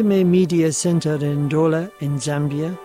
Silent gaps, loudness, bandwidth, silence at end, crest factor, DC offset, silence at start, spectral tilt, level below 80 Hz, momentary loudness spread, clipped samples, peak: none; -19 LUFS; 15.5 kHz; 0 s; 12 dB; under 0.1%; 0 s; -6.5 dB/octave; -56 dBFS; 7 LU; under 0.1%; -8 dBFS